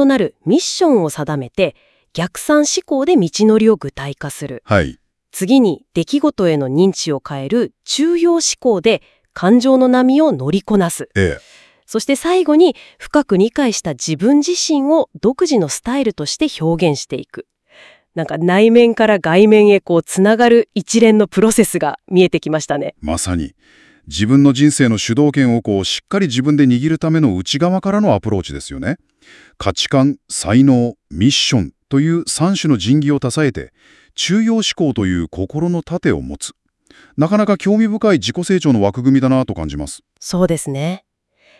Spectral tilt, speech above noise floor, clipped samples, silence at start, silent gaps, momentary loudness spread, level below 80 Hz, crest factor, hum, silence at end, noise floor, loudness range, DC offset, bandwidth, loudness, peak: -5 dB/octave; 40 dB; under 0.1%; 0 s; none; 12 LU; -44 dBFS; 14 dB; none; 0.6 s; -54 dBFS; 5 LU; under 0.1%; 12 kHz; -15 LUFS; 0 dBFS